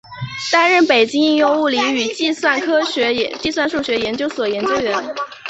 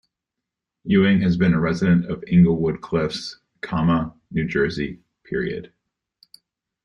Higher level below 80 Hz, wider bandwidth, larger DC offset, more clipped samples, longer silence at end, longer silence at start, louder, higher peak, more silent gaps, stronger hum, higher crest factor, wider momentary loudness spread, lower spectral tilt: second, -54 dBFS vs -48 dBFS; first, 8.2 kHz vs 7.2 kHz; neither; neither; second, 0 s vs 1.2 s; second, 0.1 s vs 0.85 s; first, -16 LUFS vs -21 LUFS; first, -2 dBFS vs -6 dBFS; neither; neither; about the same, 16 dB vs 16 dB; second, 8 LU vs 14 LU; second, -3.5 dB/octave vs -8 dB/octave